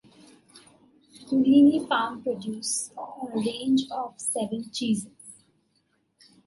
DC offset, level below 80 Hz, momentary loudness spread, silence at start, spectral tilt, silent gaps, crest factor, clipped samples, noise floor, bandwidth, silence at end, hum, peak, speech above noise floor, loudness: under 0.1%; -72 dBFS; 15 LU; 0.55 s; -4 dB/octave; none; 18 dB; under 0.1%; -71 dBFS; 11.5 kHz; 1.15 s; none; -8 dBFS; 46 dB; -25 LUFS